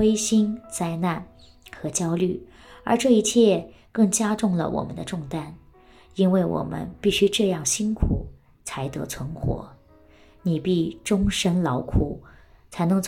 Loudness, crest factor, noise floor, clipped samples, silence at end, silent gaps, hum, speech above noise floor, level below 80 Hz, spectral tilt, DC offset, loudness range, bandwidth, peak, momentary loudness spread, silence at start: -24 LUFS; 18 dB; -53 dBFS; under 0.1%; 0 s; none; none; 30 dB; -40 dBFS; -5 dB/octave; under 0.1%; 5 LU; 16 kHz; -6 dBFS; 14 LU; 0 s